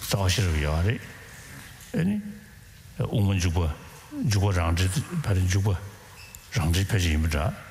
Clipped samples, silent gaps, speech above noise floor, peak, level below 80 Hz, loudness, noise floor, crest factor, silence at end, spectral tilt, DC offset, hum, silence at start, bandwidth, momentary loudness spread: under 0.1%; none; 23 dB; -10 dBFS; -36 dBFS; -26 LUFS; -47 dBFS; 16 dB; 0 s; -5.5 dB/octave; under 0.1%; none; 0 s; 16 kHz; 19 LU